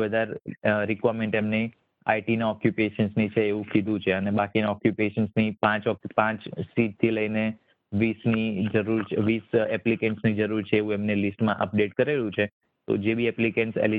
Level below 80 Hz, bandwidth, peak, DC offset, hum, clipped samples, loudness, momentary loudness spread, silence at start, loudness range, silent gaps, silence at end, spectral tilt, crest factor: -62 dBFS; 4.7 kHz; -6 dBFS; under 0.1%; none; under 0.1%; -26 LUFS; 4 LU; 0 s; 1 LU; 12.52-12.61 s; 0 s; -10 dB/octave; 20 dB